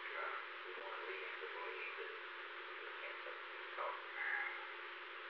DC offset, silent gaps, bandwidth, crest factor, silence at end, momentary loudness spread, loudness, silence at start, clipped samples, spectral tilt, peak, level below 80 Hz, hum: under 0.1%; none; 6.4 kHz; 18 dB; 0 s; 7 LU; -46 LUFS; 0 s; under 0.1%; 4.5 dB/octave; -28 dBFS; under -90 dBFS; none